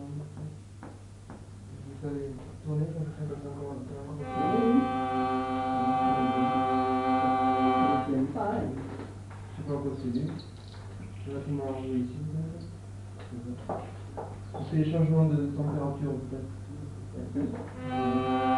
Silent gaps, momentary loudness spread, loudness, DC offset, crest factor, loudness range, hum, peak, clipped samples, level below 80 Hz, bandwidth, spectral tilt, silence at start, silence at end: none; 18 LU; -30 LUFS; under 0.1%; 18 dB; 10 LU; none; -12 dBFS; under 0.1%; -54 dBFS; 11 kHz; -8 dB/octave; 0 s; 0 s